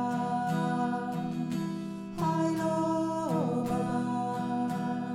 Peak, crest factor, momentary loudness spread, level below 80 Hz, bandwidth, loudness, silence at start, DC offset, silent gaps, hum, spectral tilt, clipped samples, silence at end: -18 dBFS; 14 dB; 5 LU; -62 dBFS; 14.5 kHz; -31 LUFS; 0 s; under 0.1%; none; none; -7 dB/octave; under 0.1%; 0 s